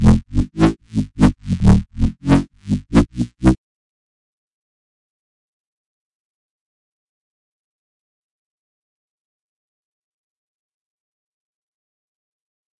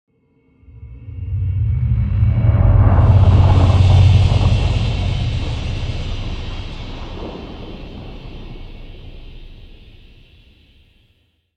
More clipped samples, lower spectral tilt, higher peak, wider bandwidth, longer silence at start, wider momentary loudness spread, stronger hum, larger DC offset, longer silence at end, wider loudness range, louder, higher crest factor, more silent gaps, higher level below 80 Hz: neither; about the same, -8 dB/octave vs -7.5 dB/octave; about the same, 0 dBFS vs -2 dBFS; first, 11.5 kHz vs 8 kHz; second, 0 s vs 0.75 s; second, 9 LU vs 24 LU; neither; neither; first, 9.25 s vs 1.9 s; second, 8 LU vs 21 LU; second, -18 LUFS vs -15 LUFS; first, 22 dB vs 14 dB; neither; second, -30 dBFS vs -24 dBFS